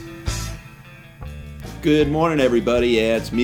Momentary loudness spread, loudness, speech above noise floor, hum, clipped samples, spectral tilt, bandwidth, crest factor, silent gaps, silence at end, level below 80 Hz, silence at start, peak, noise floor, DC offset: 19 LU; -19 LUFS; 25 dB; none; under 0.1%; -5.5 dB/octave; 18.5 kHz; 16 dB; none; 0 s; -36 dBFS; 0 s; -4 dBFS; -42 dBFS; under 0.1%